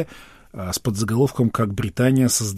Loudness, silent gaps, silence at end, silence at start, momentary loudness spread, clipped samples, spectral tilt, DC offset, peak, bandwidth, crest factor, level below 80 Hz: -21 LUFS; none; 0 s; 0 s; 14 LU; under 0.1%; -5 dB/octave; under 0.1%; -6 dBFS; 16 kHz; 16 dB; -48 dBFS